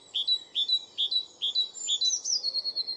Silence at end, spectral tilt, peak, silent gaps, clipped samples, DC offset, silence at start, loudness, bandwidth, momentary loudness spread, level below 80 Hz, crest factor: 0 s; 3.5 dB/octave; -16 dBFS; none; under 0.1%; under 0.1%; 0.15 s; -26 LUFS; 11.5 kHz; 3 LU; -84 dBFS; 14 dB